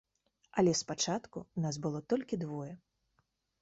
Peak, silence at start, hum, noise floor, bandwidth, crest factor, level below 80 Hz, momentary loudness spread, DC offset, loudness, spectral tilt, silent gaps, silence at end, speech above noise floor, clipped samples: -16 dBFS; 0.55 s; none; -79 dBFS; 8 kHz; 20 dB; -70 dBFS; 13 LU; under 0.1%; -35 LUFS; -5.5 dB/octave; none; 0.85 s; 44 dB; under 0.1%